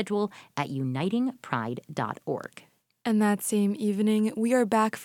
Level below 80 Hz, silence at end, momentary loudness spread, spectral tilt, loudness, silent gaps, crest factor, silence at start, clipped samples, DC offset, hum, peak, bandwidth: -74 dBFS; 0 s; 9 LU; -6 dB/octave; -28 LUFS; none; 18 dB; 0 s; under 0.1%; under 0.1%; none; -8 dBFS; 16.5 kHz